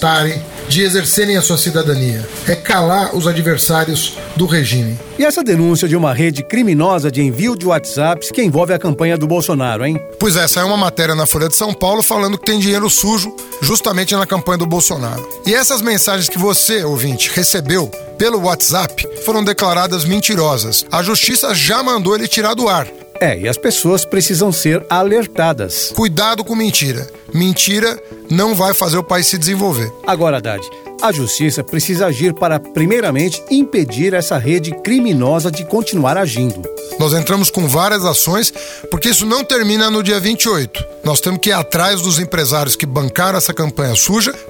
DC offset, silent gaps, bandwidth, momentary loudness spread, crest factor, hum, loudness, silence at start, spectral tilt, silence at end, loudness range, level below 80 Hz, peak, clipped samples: under 0.1%; none; over 20 kHz; 6 LU; 14 dB; none; -13 LUFS; 0 s; -3.5 dB/octave; 0 s; 2 LU; -42 dBFS; 0 dBFS; under 0.1%